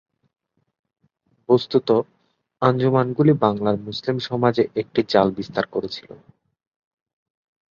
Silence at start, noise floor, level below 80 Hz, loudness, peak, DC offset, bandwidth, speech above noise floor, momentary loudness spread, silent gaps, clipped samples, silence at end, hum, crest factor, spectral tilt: 1.5 s; -66 dBFS; -58 dBFS; -21 LUFS; -2 dBFS; under 0.1%; 7.2 kHz; 46 dB; 9 LU; none; under 0.1%; 1.75 s; none; 20 dB; -8 dB/octave